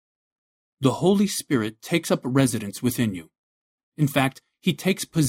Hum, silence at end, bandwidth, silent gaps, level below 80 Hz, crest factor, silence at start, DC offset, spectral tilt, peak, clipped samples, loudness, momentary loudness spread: none; 0 s; 16.5 kHz; 3.38-3.92 s; -58 dBFS; 20 dB; 0.8 s; under 0.1%; -5.5 dB/octave; -4 dBFS; under 0.1%; -24 LUFS; 6 LU